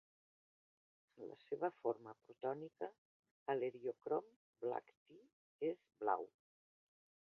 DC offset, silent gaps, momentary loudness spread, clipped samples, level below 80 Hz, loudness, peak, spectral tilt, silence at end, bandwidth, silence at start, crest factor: under 0.1%; 2.98-3.23 s, 3.31-3.46 s, 4.36-4.53 s, 4.97-5.06 s, 5.33-5.59 s; 13 LU; under 0.1%; under -90 dBFS; -45 LUFS; -22 dBFS; -5.5 dB/octave; 1.1 s; 5.4 kHz; 1.15 s; 24 dB